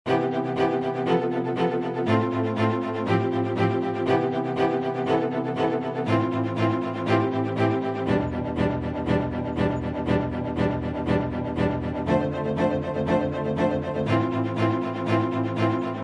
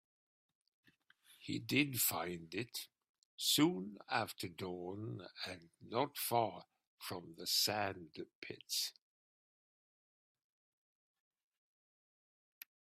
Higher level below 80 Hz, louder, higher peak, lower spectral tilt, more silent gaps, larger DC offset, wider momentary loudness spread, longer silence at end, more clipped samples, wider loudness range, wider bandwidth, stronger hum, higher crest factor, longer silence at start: first, -48 dBFS vs -80 dBFS; first, -25 LUFS vs -38 LUFS; first, -8 dBFS vs -16 dBFS; first, -8 dB/octave vs -3 dB/octave; second, none vs 3.09-3.38 s, 6.87-6.98 s, 8.35-8.42 s; neither; second, 3 LU vs 18 LU; second, 0 s vs 3.95 s; neither; second, 1 LU vs 10 LU; second, 10 kHz vs 16 kHz; neither; second, 16 dB vs 26 dB; second, 0.05 s vs 1.3 s